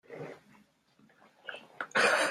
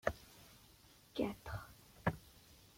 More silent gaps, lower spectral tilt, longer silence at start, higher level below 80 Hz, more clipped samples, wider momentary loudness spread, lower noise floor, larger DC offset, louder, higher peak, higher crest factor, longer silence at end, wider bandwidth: neither; second, -1.5 dB/octave vs -6 dB/octave; about the same, 0.1 s vs 0.05 s; second, -84 dBFS vs -62 dBFS; neither; about the same, 22 LU vs 20 LU; about the same, -66 dBFS vs -65 dBFS; neither; first, -29 LUFS vs -44 LUFS; first, -14 dBFS vs -18 dBFS; second, 20 dB vs 28 dB; about the same, 0 s vs 0.1 s; second, 14.5 kHz vs 16.5 kHz